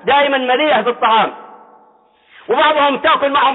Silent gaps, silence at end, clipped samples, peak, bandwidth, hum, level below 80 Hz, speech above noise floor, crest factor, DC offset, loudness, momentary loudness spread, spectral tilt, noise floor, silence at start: none; 0 s; under 0.1%; -4 dBFS; 4.1 kHz; none; -60 dBFS; 38 dB; 10 dB; under 0.1%; -13 LUFS; 3 LU; -7.5 dB/octave; -51 dBFS; 0.05 s